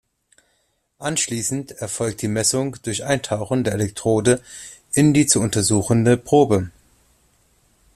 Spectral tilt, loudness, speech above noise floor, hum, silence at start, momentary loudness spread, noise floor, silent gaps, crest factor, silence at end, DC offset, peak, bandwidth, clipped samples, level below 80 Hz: -4.5 dB/octave; -19 LUFS; 48 dB; none; 1 s; 11 LU; -67 dBFS; none; 20 dB; 1.25 s; under 0.1%; -2 dBFS; 15 kHz; under 0.1%; -52 dBFS